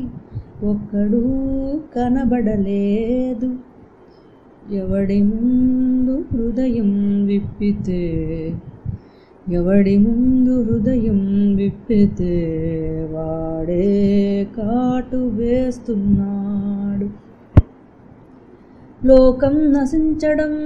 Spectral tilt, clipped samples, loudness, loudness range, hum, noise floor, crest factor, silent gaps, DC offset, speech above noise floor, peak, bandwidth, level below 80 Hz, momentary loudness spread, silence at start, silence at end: -9.5 dB/octave; under 0.1%; -18 LUFS; 4 LU; none; -46 dBFS; 18 dB; none; under 0.1%; 29 dB; 0 dBFS; 7.2 kHz; -32 dBFS; 10 LU; 0 s; 0 s